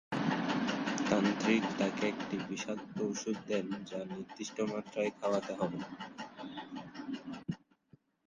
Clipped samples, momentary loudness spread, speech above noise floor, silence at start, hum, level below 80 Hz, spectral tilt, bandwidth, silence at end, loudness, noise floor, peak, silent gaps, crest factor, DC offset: under 0.1%; 14 LU; 31 dB; 0.1 s; none; -72 dBFS; -5 dB/octave; 9.8 kHz; 0.7 s; -36 LUFS; -67 dBFS; -16 dBFS; none; 20 dB; under 0.1%